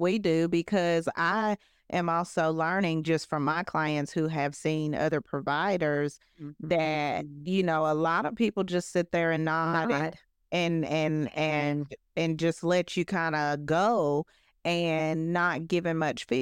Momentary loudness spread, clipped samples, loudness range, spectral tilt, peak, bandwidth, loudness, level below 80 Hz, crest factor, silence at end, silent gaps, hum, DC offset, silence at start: 5 LU; under 0.1%; 1 LU; -6 dB/octave; -14 dBFS; 11 kHz; -28 LUFS; -66 dBFS; 16 dB; 0 s; none; none; under 0.1%; 0 s